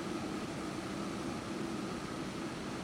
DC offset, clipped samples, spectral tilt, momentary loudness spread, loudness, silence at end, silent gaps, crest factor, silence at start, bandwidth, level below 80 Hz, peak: under 0.1%; under 0.1%; -5 dB/octave; 1 LU; -40 LUFS; 0 s; none; 14 dB; 0 s; 16 kHz; -60 dBFS; -26 dBFS